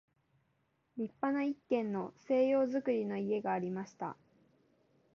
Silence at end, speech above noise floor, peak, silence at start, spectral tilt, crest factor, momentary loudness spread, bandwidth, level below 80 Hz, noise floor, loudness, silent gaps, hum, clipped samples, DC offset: 1.05 s; 43 dB; -20 dBFS; 0.95 s; -6.5 dB/octave; 16 dB; 13 LU; 6.8 kHz; -80 dBFS; -78 dBFS; -35 LUFS; none; none; under 0.1%; under 0.1%